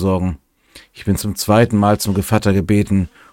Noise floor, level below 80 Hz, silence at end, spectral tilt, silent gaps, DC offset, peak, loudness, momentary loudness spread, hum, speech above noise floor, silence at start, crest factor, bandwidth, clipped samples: -46 dBFS; -38 dBFS; 0.25 s; -6 dB/octave; none; under 0.1%; 0 dBFS; -16 LUFS; 9 LU; none; 30 dB; 0 s; 16 dB; 17 kHz; under 0.1%